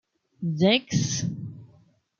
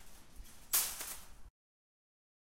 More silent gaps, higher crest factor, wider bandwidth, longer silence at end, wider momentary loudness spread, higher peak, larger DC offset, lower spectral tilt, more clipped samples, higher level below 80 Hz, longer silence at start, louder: neither; second, 20 dB vs 26 dB; second, 7.6 kHz vs 16 kHz; second, 0.55 s vs 1.05 s; second, 16 LU vs 25 LU; first, -6 dBFS vs -18 dBFS; neither; first, -4.5 dB/octave vs 1 dB/octave; neither; about the same, -62 dBFS vs -60 dBFS; first, 0.4 s vs 0 s; first, -25 LUFS vs -35 LUFS